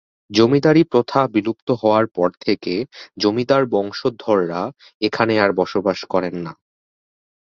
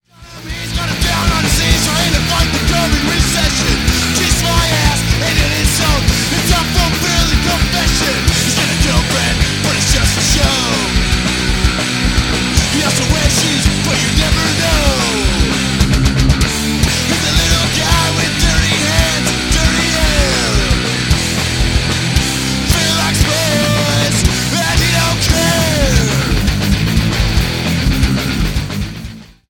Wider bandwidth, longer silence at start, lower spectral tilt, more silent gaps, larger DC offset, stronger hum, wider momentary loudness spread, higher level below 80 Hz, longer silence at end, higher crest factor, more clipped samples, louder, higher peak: second, 7.2 kHz vs 17.5 kHz; about the same, 0.3 s vs 0.2 s; first, -6.5 dB/octave vs -3.5 dB/octave; first, 1.62-1.67 s, 4.94-5.00 s vs none; neither; neither; first, 11 LU vs 3 LU; second, -58 dBFS vs -20 dBFS; first, 1 s vs 0.25 s; about the same, 18 dB vs 14 dB; neither; second, -19 LUFS vs -13 LUFS; about the same, -2 dBFS vs 0 dBFS